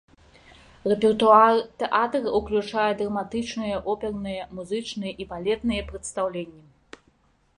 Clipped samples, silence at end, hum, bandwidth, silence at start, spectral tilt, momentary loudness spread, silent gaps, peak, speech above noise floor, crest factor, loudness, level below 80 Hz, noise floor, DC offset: under 0.1%; 1.05 s; none; 11 kHz; 0.85 s; -5 dB/octave; 16 LU; none; -4 dBFS; 39 dB; 20 dB; -24 LUFS; -50 dBFS; -63 dBFS; under 0.1%